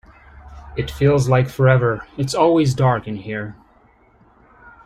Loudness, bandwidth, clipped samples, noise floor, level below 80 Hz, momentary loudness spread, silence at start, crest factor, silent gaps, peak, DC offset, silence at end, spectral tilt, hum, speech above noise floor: -18 LUFS; 12.5 kHz; under 0.1%; -53 dBFS; -42 dBFS; 13 LU; 0.45 s; 16 dB; none; -2 dBFS; under 0.1%; 1.35 s; -7 dB/octave; none; 36 dB